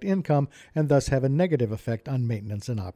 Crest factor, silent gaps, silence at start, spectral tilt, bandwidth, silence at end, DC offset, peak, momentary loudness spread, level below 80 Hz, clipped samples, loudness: 14 dB; none; 0 s; -7.5 dB/octave; 12.5 kHz; 0.05 s; under 0.1%; -10 dBFS; 9 LU; -48 dBFS; under 0.1%; -26 LUFS